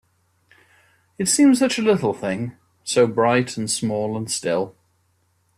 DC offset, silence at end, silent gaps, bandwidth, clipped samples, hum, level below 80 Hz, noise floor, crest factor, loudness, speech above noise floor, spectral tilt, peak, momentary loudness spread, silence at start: under 0.1%; 0.9 s; none; 14 kHz; under 0.1%; none; -62 dBFS; -65 dBFS; 16 dB; -20 LUFS; 46 dB; -4 dB/octave; -6 dBFS; 12 LU; 1.2 s